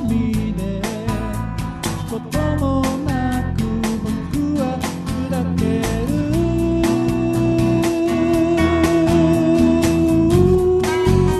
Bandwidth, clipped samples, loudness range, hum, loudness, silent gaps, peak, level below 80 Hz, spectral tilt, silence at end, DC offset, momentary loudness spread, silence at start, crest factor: 13 kHz; under 0.1%; 6 LU; none; -18 LUFS; none; 0 dBFS; -30 dBFS; -7 dB/octave; 0 s; under 0.1%; 9 LU; 0 s; 16 dB